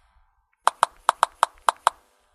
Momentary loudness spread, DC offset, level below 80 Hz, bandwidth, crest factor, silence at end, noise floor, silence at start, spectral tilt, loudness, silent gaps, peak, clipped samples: 3 LU; under 0.1%; -64 dBFS; 16 kHz; 26 dB; 0.65 s; -64 dBFS; 0.65 s; 1 dB/octave; -24 LUFS; none; 0 dBFS; under 0.1%